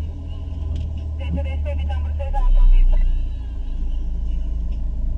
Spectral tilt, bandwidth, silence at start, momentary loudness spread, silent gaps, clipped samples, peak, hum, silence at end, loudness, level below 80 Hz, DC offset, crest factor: -8.5 dB/octave; 3.3 kHz; 0 s; 10 LU; none; under 0.1%; -6 dBFS; none; 0 s; -25 LUFS; -18 dBFS; under 0.1%; 12 dB